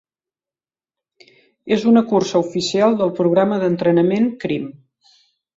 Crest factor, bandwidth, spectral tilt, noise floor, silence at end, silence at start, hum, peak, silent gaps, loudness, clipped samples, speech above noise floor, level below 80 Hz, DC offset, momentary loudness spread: 16 dB; 7.8 kHz; -6 dB/octave; under -90 dBFS; 0.85 s; 1.65 s; none; -4 dBFS; none; -17 LUFS; under 0.1%; over 74 dB; -60 dBFS; under 0.1%; 9 LU